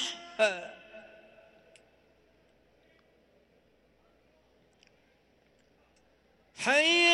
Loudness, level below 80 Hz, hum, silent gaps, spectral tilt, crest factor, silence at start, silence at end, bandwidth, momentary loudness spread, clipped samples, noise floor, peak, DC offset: -27 LUFS; -76 dBFS; none; none; -1 dB/octave; 22 dB; 0 s; 0 s; 12 kHz; 30 LU; under 0.1%; -67 dBFS; -12 dBFS; under 0.1%